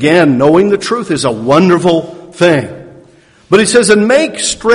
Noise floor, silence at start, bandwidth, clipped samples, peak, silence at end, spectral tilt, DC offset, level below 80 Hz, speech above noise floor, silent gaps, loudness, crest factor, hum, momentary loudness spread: -43 dBFS; 0 s; 11 kHz; 0.7%; 0 dBFS; 0 s; -4.5 dB/octave; under 0.1%; -46 dBFS; 34 dB; none; -10 LUFS; 10 dB; none; 7 LU